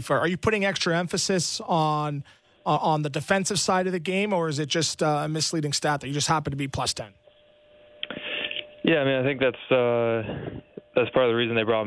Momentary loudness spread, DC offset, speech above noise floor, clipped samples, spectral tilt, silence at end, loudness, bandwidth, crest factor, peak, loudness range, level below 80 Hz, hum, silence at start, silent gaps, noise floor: 10 LU; under 0.1%; 32 dB; under 0.1%; -4 dB/octave; 0 s; -25 LUFS; 11 kHz; 18 dB; -8 dBFS; 3 LU; -56 dBFS; none; 0 s; none; -57 dBFS